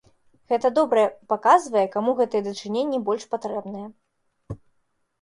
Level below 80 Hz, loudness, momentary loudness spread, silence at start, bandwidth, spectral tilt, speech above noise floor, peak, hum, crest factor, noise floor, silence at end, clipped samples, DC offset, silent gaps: -60 dBFS; -23 LUFS; 22 LU; 0.5 s; 11.5 kHz; -5 dB/octave; 47 dB; -4 dBFS; none; 20 dB; -70 dBFS; 0.65 s; under 0.1%; under 0.1%; none